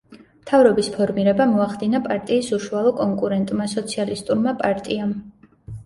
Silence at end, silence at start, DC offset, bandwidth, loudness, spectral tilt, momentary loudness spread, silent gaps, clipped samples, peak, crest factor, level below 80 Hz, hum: 0.05 s; 0.1 s; under 0.1%; 11.5 kHz; -20 LUFS; -6 dB/octave; 8 LU; none; under 0.1%; -2 dBFS; 18 dB; -54 dBFS; none